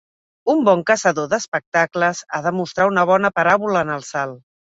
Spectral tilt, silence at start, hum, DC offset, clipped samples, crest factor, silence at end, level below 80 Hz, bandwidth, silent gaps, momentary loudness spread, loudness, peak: -4.5 dB/octave; 0.45 s; none; under 0.1%; under 0.1%; 18 dB; 0.35 s; -60 dBFS; 8 kHz; 1.48-1.52 s, 1.66-1.72 s; 8 LU; -18 LUFS; 0 dBFS